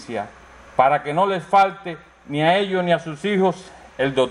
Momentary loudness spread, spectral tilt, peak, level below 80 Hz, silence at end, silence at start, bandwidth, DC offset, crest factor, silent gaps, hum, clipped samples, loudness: 17 LU; -6 dB/octave; -2 dBFS; -56 dBFS; 0 s; 0 s; 11 kHz; under 0.1%; 18 dB; none; none; under 0.1%; -20 LUFS